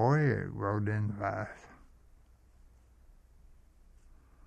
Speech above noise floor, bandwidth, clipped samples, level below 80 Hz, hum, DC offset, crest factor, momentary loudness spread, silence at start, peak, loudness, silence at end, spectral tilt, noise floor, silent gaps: 28 dB; 8.4 kHz; under 0.1%; -58 dBFS; none; under 0.1%; 20 dB; 14 LU; 0 s; -14 dBFS; -33 LUFS; 0.3 s; -9 dB/octave; -60 dBFS; none